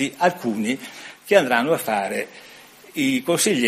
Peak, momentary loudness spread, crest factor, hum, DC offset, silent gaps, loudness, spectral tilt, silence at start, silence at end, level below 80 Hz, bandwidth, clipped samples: -2 dBFS; 17 LU; 20 dB; none; under 0.1%; none; -21 LUFS; -3.5 dB/octave; 0 s; 0 s; -68 dBFS; 15.5 kHz; under 0.1%